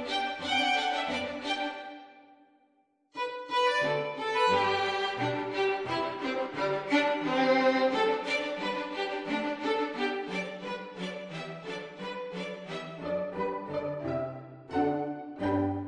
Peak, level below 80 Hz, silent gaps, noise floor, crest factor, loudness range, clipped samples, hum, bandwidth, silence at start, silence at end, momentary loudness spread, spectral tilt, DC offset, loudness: -14 dBFS; -68 dBFS; none; -70 dBFS; 18 dB; 8 LU; under 0.1%; none; 10 kHz; 0 s; 0 s; 13 LU; -4.5 dB/octave; under 0.1%; -31 LUFS